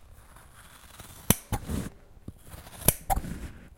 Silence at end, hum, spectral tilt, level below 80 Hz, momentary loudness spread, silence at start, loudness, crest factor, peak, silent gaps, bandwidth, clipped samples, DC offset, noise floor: 0.05 s; none; -3.5 dB/octave; -42 dBFS; 23 LU; 0 s; -29 LUFS; 30 dB; -2 dBFS; none; 16.5 kHz; under 0.1%; under 0.1%; -51 dBFS